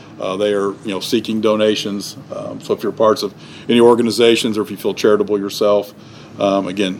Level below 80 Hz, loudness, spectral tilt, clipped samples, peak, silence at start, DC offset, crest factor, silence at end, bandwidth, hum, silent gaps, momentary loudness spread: -62 dBFS; -16 LUFS; -4.5 dB/octave; under 0.1%; 0 dBFS; 0 s; under 0.1%; 16 dB; 0 s; 18 kHz; none; none; 15 LU